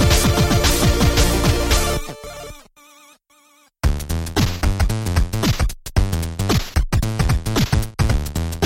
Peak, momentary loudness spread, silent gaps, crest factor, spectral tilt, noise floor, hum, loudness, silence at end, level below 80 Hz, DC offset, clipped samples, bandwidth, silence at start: -2 dBFS; 9 LU; none; 16 dB; -4.5 dB/octave; -55 dBFS; none; -19 LUFS; 0 s; -22 dBFS; under 0.1%; under 0.1%; 16.5 kHz; 0 s